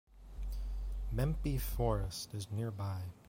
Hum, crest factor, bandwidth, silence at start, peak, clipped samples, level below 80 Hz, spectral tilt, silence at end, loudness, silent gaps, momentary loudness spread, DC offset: none; 18 dB; 16.5 kHz; 0.1 s; -20 dBFS; under 0.1%; -42 dBFS; -6 dB/octave; 0 s; -39 LUFS; none; 9 LU; under 0.1%